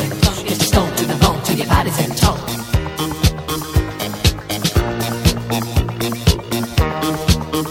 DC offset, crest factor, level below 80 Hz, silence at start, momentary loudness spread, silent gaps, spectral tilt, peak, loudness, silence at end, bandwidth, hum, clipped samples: under 0.1%; 18 dB; -26 dBFS; 0 s; 5 LU; none; -4.5 dB/octave; 0 dBFS; -18 LUFS; 0 s; 17 kHz; none; under 0.1%